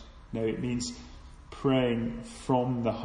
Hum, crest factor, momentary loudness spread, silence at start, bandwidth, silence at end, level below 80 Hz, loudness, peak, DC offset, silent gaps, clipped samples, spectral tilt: none; 18 dB; 16 LU; 0 s; 10.5 kHz; 0 s; -50 dBFS; -30 LUFS; -12 dBFS; under 0.1%; none; under 0.1%; -6 dB/octave